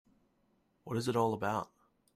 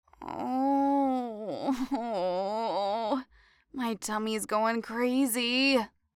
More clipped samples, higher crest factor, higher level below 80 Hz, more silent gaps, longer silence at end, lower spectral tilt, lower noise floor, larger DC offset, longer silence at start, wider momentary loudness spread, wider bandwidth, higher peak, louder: neither; about the same, 20 dB vs 16 dB; second, -70 dBFS vs -64 dBFS; neither; first, 0.5 s vs 0.3 s; first, -6 dB/octave vs -3.5 dB/octave; first, -74 dBFS vs -63 dBFS; neither; first, 0.85 s vs 0.2 s; about the same, 8 LU vs 9 LU; about the same, 15.5 kHz vs 16.5 kHz; second, -18 dBFS vs -14 dBFS; second, -35 LUFS vs -29 LUFS